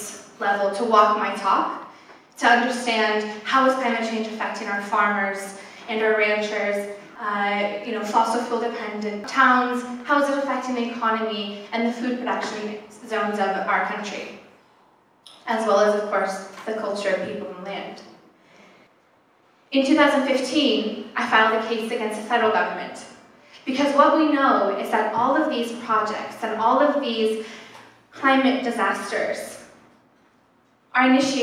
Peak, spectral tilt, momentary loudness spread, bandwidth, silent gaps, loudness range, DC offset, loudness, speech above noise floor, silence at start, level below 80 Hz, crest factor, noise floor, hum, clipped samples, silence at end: -2 dBFS; -3.5 dB/octave; 14 LU; 15 kHz; none; 5 LU; under 0.1%; -22 LUFS; 38 dB; 0 s; -74 dBFS; 20 dB; -60 dBFS; none; under 0.1%; 0 s